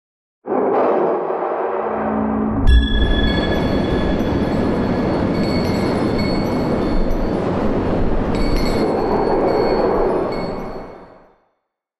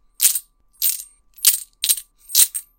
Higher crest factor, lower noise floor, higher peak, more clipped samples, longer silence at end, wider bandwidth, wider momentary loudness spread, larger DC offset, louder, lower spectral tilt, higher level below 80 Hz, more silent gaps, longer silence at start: second, 14 dB vs 22 dB; first, -72 dBFS vs -37 dBFS; about the same, -2 dBFS vs 0 dBFS; neither; first, 0.8 s vs 0.2 s; second, 12.5 kHz vs over 20 kHz; about the same, 5 LU vs 7 LU; first, 0.5% vs under 0.1%; about the same, -19 LUFS vs -17 LUFS; first, -7.5 dB/octave vs 5.5 dB/octave; first, -24 dBFS vs -62 dBFS; neither; first, 0.45 s vs 0.2 s